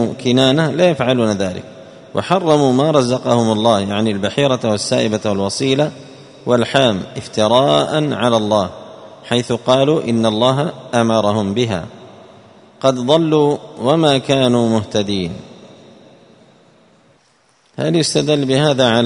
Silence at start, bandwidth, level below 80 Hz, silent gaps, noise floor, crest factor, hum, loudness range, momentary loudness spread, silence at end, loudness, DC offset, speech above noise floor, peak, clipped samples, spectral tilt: 0 s; 11 kHz; -52 dBFS; none; -55 dBFS; 16 dB; none; 4 LU; 10 LU; 0 s; -15 LUFS; under 0.1%; 41 dB; 0 dBFS; under 0.1%; -5.5 dB/octave